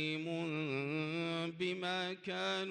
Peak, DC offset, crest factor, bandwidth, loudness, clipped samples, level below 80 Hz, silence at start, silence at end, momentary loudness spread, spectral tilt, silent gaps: -24 dBFS; under 0.1%; 14 dB; 10.5 kHz; -38 LUFS; under 0.1%; -84 dBFS; 0 s; 0 s; 2 LU; -5.5 dB/octave; none